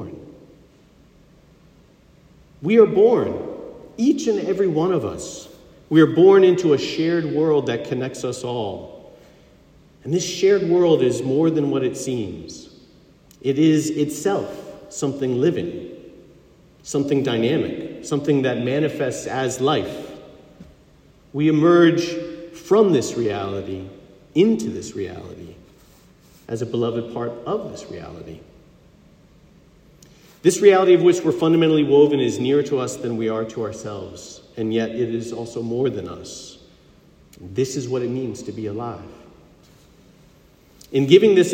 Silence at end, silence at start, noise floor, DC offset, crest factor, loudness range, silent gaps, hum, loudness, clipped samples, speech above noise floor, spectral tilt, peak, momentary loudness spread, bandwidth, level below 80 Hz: 0 s; 0 s; -52 dBFS; under 0.1%; 20 dB; 11 LU; none; none; -19 LUFS; under 0.1%; 33 dB; -6 dB/octave; 0 dBFS; 21 LU; 15.5 kHz; -58 dBFS